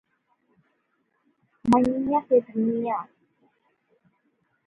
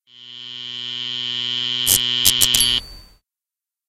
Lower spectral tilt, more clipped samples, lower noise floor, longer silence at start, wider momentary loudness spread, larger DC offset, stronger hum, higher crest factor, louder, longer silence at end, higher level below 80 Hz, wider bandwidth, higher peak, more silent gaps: first, -8 dB/octave vs 0.5 dB/octave; neither; second, -72 dBFS vs -89 dBFS; first, 1.65 s vs 0.15 s; second, 10 LU vs 18 LU; neither; neither; about the same, 20 dB vs 22 dB; second, -24 LUFS vs -17 LUFS; first, 1.6 s vs 0.85 s; second, -60 dBFS vs -46 dBFS; second, 11.5 kHz vs 16 kHz; second, -8 dBFS vs 0 dBFS; neither